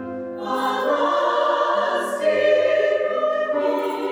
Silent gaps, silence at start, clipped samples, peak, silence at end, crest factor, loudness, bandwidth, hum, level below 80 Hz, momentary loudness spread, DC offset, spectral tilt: none; 0 s; under 0.1%; -8 dBFS; 0 s; 14 dB; -20 LUFS; over 20 kHz; none; -74 dBFS; 6 LU; under 0.1%; -3.5 dB/octave